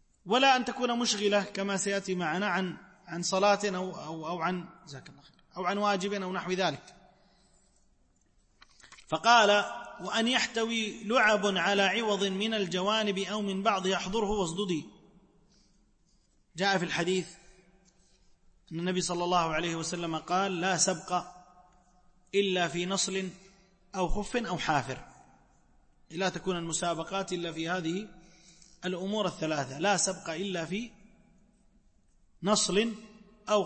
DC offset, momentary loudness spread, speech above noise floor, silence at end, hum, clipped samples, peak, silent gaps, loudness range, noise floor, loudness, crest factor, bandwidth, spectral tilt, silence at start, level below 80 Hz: under 0.1%; 13 LU; 38 dB; 0 s; none; under 0.1%; -10 dBFS; none; 7 LU; -67 dBFS; -29 LUFS; 20 dB; 8.8 kHz; -3.5 dB/octave; 0.25 s; -52 dBFS